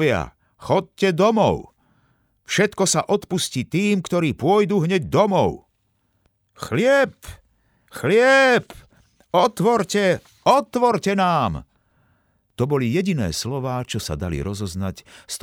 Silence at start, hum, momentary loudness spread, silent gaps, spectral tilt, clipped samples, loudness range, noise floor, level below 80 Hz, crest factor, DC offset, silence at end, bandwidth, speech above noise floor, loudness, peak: 0 s; none; 11 LU; none; -5 dB/octave; under 0.1%; 5 LU; -68 dBFS; -48 dBFS; 18 dB; under 0.1%; 0.05 s; 17 kHz; 48 dB; -20 LUFS; -4 dBFS